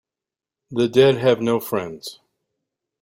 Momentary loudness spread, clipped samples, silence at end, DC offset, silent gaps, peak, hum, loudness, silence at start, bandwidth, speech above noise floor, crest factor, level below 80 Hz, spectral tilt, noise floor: 18 LU; under 0.1%; 0.9 s; under 0.1%; none; -2 dBFS; none; -19 LUFS; 0.7 s; 16 kHz; 70 dB; 20 dB; -62 dBFS; -6 dB/octave; -89 dBFS